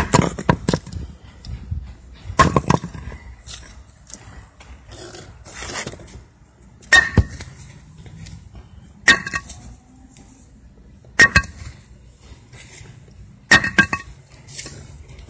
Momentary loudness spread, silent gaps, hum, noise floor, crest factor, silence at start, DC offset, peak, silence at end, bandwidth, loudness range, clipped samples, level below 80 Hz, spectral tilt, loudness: 27 LU; none; none; -48 dBFS; 22 dB; 0 s; under 0.1%; 0 dBFS; 0.1 s; 8 kHz; 11 LU; under 0.1%; -36 dBFS; -4 dB/octave; -17 LUFS